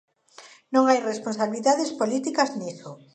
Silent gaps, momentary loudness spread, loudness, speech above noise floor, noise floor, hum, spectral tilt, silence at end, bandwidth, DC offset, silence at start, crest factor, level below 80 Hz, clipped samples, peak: none; 12 LU; -24 LUFS; 27 dB; -50 dBFS; none; -4 dB/octave; 0.2 s; 9.4 kHz; under 0.1%; 0.4 s; 20 dB; -78 dBFS; under 0.1%; -4 dBFS